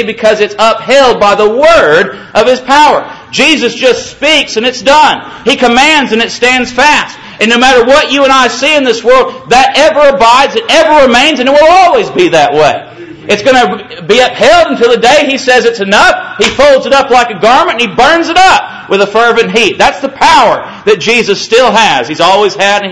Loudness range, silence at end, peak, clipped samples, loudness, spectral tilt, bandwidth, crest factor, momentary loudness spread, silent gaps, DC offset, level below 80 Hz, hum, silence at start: 2 LU; 0 s; 0 dBFS; 6%; -6 LUFS; -3 dB/octave; 11 kHz; 6 dB; 6 LU; none; under 0.1%; -36 dBFS; none; 0 s